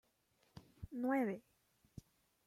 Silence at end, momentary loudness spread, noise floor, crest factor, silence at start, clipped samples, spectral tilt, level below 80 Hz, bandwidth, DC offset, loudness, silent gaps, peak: 1.05 s; 25 LU; -78 dBFS; 20 dB; 0.55 s; under 0.1%; -7.5 dB/octave; -70 dBFS; 15 kHz; under 0.1%; -41 LUFS; none; -26 dBFS